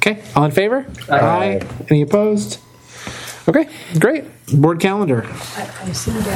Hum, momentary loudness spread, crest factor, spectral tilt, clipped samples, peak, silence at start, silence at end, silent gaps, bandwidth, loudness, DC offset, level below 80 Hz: none; 13 LU; 18 dB; -6 dB/octave; under 0.1%; 0 dBFS; 0 s; 0 s; none; 17 kHz; -17 LUFS; under 0.1%; -44 dBFS